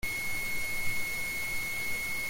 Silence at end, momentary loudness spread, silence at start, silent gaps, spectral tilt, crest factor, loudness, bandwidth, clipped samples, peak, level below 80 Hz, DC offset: 0 s; 0 LU; 0.05 s; none; -1.5 dB/octave; 12 dB; -32 LUFS; 17 kHz; under 0.1%; -18 dBFS; -46 dBFS; under 0.1%